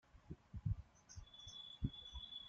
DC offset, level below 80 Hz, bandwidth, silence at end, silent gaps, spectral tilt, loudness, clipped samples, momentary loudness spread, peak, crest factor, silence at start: under 0.1%; -56 dBFS; 7.6 kHz; 0 s; none; -5.5 dB/octave; -51 LUFS; under 0.1%; 13 LU; -26 dBFS; 22 dB; 0.15 s